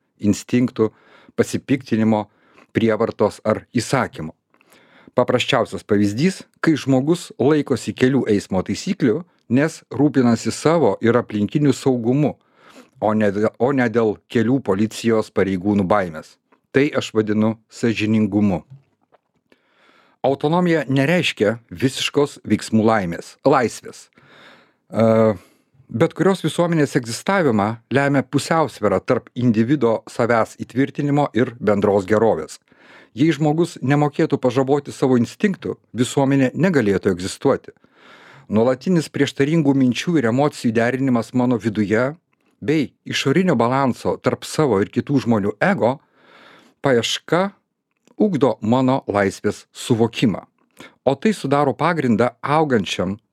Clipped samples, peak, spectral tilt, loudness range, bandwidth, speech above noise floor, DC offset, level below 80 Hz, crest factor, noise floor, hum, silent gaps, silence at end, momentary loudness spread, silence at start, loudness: under 0.1%; -2 dBFS; -6 dB/octave; 2 LU; 14.5 kHz; 45 dB; under 0.1%; -58 dBFS; 18 dB; -63 dBFS; none; none; 0.15 s; 6 LU; 0.2 s; -19 LUFS